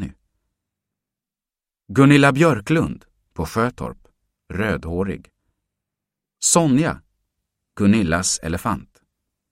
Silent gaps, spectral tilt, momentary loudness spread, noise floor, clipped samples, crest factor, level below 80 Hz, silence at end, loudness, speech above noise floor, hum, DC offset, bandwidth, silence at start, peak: none; -5 dB/octave; 19 LU; -90 dBFS; under 0.1%; 20 dB; -44 dBFS; 0.7 s; -19 LUFS; 72 dB; none; under 0.1%; 16 kHz; 0 s; 0 dBFS